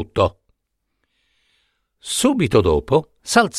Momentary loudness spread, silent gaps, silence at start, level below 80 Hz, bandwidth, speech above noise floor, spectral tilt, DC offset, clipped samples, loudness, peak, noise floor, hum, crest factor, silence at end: 6 LU; none; 0 s; -40 dBFS; 15 kHz; 57 dB; -4.5 dB/octave; under 0.1%; under 0.1%; -18 LUFS; 0 dBFS; -74 dBFS; none; 20 dB; 0 s